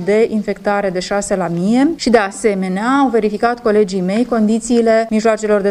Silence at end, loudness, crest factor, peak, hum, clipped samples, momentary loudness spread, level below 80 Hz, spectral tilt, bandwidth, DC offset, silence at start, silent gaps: 0 s; -15 LUFS; 14 dB; 0 dBFS; none; under 0.1%; 5 LU; -46 dBFS; -5.5 dB/octave; 12 kHz; under 0.1%; 0 s; none